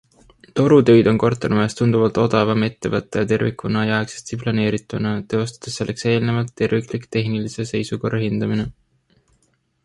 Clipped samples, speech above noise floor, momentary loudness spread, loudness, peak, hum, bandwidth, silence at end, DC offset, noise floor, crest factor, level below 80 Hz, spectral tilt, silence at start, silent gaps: under 0.1%; 46 dB; 11 LU; -19 LUFS; -2 dBFS; none; 11.5 kHz; 1.15 s; under 0.1%; -64 dBFS; 18 dB; -50 dBFS; -6.5 dB/octave; 0.55 s; none